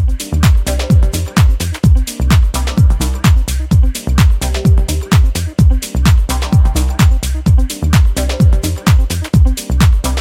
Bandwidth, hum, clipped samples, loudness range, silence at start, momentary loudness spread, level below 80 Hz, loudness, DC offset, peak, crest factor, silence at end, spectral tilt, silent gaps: 16.5 kHz; none; under 0.1%; 1 LU; 0 s; 2 LU; -14 dBFS; -13 LUFS; 0.2%; 0 dBFS; 10 dB; 0 s; -5.5 dB/octave; none